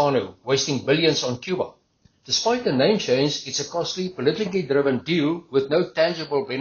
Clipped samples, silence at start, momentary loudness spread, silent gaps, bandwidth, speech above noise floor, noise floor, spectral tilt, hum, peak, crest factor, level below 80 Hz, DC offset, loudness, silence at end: under 0.1%; 0 s; 7 LU; none; 7.2 kHz; 38 dB; -61 dBFS; -3.5 dB/octave; none; -6 dBFS; 16 dB; -62 dBFS; under 0.1%; -22 LUFS; 0 s